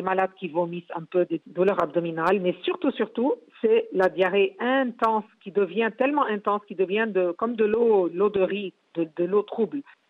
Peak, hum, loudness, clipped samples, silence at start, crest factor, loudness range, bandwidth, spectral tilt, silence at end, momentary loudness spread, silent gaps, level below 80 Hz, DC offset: -10 dBFS; none; -25 LUFS; under 0.1%; 0 s; 14 dB; 2 LU; 5.6 kHz; -7.5 dB/octave; 0.25 s; 7 LU; none; -68 dBFS; under 0.1%